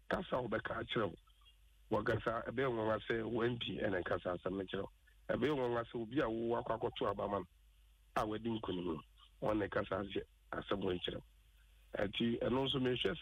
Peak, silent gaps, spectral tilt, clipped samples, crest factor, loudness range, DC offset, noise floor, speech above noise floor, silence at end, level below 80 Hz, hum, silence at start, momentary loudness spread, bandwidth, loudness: -24 dBFS; none; -7 dB/octave; under 0.1%; 16 dB; 3 LU; under 0.1%; -66 dBFS; 28 dB; 0 s; -60 dBFS; none; 0.1 s; 8 LU; 13.5 kHz; -39 LUFS